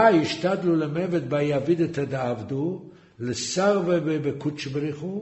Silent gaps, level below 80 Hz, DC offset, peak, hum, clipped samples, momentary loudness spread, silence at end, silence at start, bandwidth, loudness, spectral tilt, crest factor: none; -62 dBFS; under 0.1%; -4 dBFS; none; under 0.1%; 8 LU; 0 s; 0 s; 8.2 kHz; -25 LUFS; -6 dB/octave; 20 dB